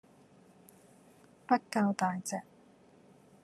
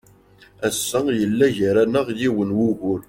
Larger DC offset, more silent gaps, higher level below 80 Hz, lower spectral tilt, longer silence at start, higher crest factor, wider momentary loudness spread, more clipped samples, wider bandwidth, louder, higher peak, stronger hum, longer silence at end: neither; neither; second, -82 dBFS vs -54 dBFS; about the same, -5 dB/octave vs -5 dB/octave; first, 1.5 s vs 0.6 s; first, 22 dB vs 16 dB; first, 12 LU vs 5 LU; neither; second, 13 kHz vs 16.5 kHz; second, -33 LUFS vs -20 LUFS; second, -14 dBFS vs -6 dBFS; neither; first, 1 s vs 0.05 s